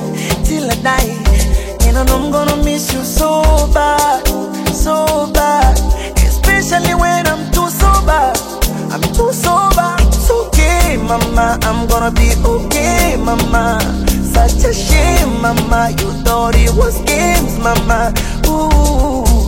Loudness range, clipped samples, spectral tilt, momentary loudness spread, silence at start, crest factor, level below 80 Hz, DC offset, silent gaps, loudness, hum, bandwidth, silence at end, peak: 1 LU; under 0.1%; -4.5 dB/octave; 5 LU; 0 s; 12 dB; -14 dBFS; 0.2%; none; -13 LUFS; none; 16.5 kHz; 0 s; 0 dBFS